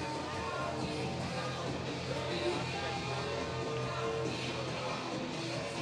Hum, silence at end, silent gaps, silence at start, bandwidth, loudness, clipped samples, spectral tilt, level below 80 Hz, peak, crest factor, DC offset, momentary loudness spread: none; 0 s; none; 0 s; 12 kHz; -37 LUFS; under 0.1%; -5 dB/octave; -62 dBFS; -22 dBFS; 14 dB; under 0.1%; 3 LU